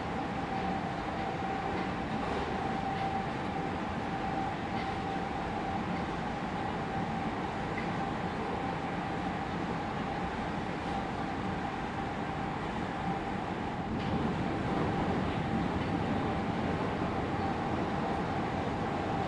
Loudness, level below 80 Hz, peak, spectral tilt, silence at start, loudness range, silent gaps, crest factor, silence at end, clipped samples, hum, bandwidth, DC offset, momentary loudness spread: -34 LUFS; -50 dBFS; -18 dBFS; -7 dB/octave; 0 s; 3 LU; none; 16 dB; 0 s; under 0.1%; none; 11 kHz; under 0.1%; 3 LU